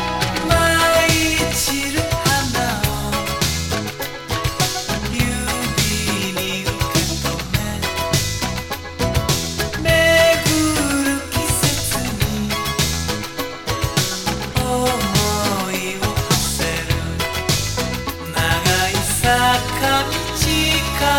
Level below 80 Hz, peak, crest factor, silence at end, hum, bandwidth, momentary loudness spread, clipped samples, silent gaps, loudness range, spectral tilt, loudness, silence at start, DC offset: -32 dBFS; -2 dBFS; 18 dB; 0 s; none; 19 kHz; 8 LU; under 0.1%; none; 4 LU; -3.5 dB/octave; -18 LUFS; 0 s; under 0.1%